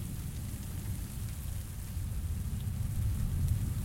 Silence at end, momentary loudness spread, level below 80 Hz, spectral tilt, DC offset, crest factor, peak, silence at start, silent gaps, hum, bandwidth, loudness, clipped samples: 0 s; 7 LU; -40 dBFS; -6 dB/octave; under 0.1%; 14 dB; -20 dBFS; 0 s; none; none; 16.5 kHz; -37 LUFS; under 0.1%